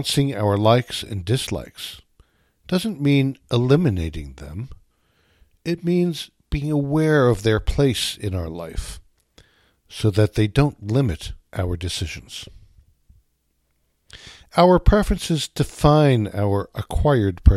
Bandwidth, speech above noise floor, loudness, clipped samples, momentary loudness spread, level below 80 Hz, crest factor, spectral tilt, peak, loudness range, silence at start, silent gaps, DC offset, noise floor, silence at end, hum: 15 kHz; 49 dB; -21 LUFS; under 0.1%; 17 LU; -32 dBFS; 20 dB; -6.5 dB/octave; 0 dBFS; 6 LU; 0 s; none; under 0.1%; -68 dBFS; 0 s; none